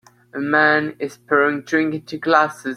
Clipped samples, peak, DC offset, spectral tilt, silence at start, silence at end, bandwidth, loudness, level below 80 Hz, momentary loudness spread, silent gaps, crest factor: under 0.1%; 0 dBFS; under 0.1%; -5.5 dB/octave; 0.35 s; 0 s; 13 kHz; -18 LUFS; -66 dBFS; 12 LU; none; 18 dB